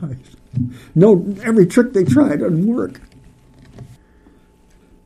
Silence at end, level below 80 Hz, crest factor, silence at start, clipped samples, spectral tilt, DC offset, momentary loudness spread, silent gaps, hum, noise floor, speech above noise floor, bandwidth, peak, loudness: 1.2 s; -50 dBFS; 18 dB; 0 s; under 0.1%; -8 dB/octave; under 0.1%; 16 LU; none; none; -50 dBFS; 35 dB; 13.5 kHz; 0 dBFS; -15 LUFS